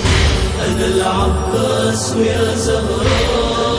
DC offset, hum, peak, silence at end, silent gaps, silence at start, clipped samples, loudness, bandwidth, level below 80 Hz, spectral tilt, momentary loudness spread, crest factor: under 0.1%; none; -2 dBFS; 0 s; none; 0 s; under 0.1%; -15 LUFS; 11 kHz; -22 dBFS; -4.5 dB/octave; 2 LU; 12 dB